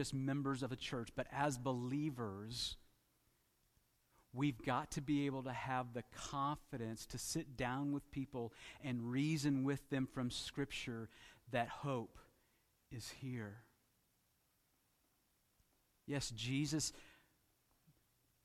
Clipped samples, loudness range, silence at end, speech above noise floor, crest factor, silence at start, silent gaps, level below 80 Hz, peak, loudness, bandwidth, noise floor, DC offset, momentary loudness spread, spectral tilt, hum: under 0.1%; 10 LU; 1.3 s; 37 dB; 20 dB; 0 s; none; -68 dBFS; -24 dBFS; -43 LUFS; 16 kHz; -79 dBFS; under 0.1%; 11 LU; -5 dB/octave; none